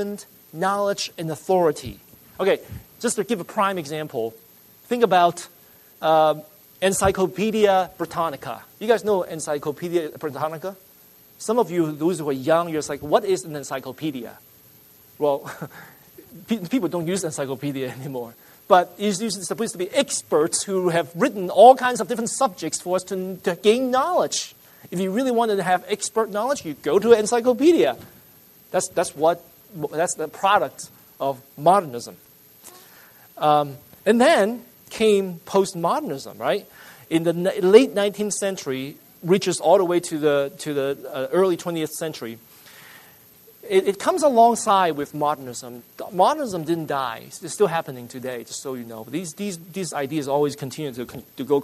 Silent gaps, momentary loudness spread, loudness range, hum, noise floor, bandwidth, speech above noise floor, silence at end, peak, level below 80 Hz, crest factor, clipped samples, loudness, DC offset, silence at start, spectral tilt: none; 15 LU; 8 LU; none; -51 dBFS; 13.5 kHz; 30 dB; 0 s; 0 dBFS; -58 dBFS; 22 dB; under 0.1%; -22 LUFS; under 0.1%; 0 s; -4.5 dB/octave